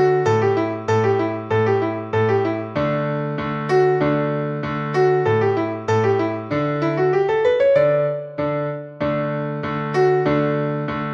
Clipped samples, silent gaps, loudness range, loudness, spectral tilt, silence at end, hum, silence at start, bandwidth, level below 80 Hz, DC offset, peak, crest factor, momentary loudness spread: under 0.1%; none; 2 LU; -20 LUFS; -8 dB/octave; 0 s; none; 0 s; 7.6 kHz; -54 dBFS; under 0.1%; -6 dBFS; 14 dB; 7 LU